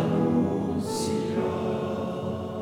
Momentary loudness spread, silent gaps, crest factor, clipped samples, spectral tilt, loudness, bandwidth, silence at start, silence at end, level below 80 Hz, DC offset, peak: 7 LU; none; 14 dB; under 0.1%; -6.5 dB/octave; -27 LUFS; 17.5 kHz; 0 s; 0 s; -54 dBFS; under 0.1%; -14 dBFS